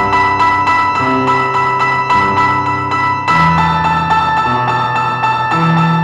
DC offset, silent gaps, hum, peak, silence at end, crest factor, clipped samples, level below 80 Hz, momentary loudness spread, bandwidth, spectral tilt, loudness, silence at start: 0.1%; none; none; -2 dBFS; 0 s; 10 dB; under 0.1%; -38 dBFS; 3 LU; 9.2 kHz; -6 dB/octave; -12 LUFS; 0 s